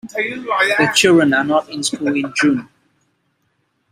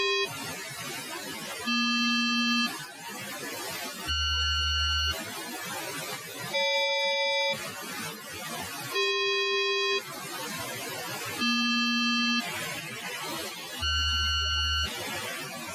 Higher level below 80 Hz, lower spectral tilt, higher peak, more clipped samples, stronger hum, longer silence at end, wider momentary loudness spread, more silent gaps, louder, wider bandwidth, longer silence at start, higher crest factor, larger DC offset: second, -60 dBFS vs -44 dBFS; about the same, -3.5 dB/octave vs -2.5 dB/octave; first, 0 dBFS vs -18 dBFS; neither; neither; first, 1.25 s vs 0 s; about the same, 10 LU vs 11 LU; neither; first, -15 LUFS vs -28 LUFS; about the same, 15.5 kHz vs 16 kHz; about the same, 0.05 s vs 0 s; about the same, 16 dB vs 14 dB; neither